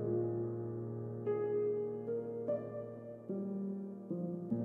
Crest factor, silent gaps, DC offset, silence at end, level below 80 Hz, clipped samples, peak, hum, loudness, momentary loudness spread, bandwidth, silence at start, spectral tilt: 14 dB; none; under 0.1%; 0 s; -76 dBFS; under 0.1%; -24 dBFS; none; -40 LUFS; 9 LU; 3.1 kHz; 0 s; -12 dB/octave